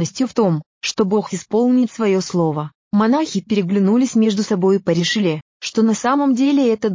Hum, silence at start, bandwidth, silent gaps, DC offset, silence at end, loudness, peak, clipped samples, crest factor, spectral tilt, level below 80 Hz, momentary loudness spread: none; 0 s; 7.6 kHz; 0.66-0.81 s, 2.75-2.91 s, 5.42-5.60 s; under 0.1%; 0 s; -18 LUFS; -6 dBFS; under 0.1%; 12 dB; -5.5 dB/octave; -62 dBFS; 6 LU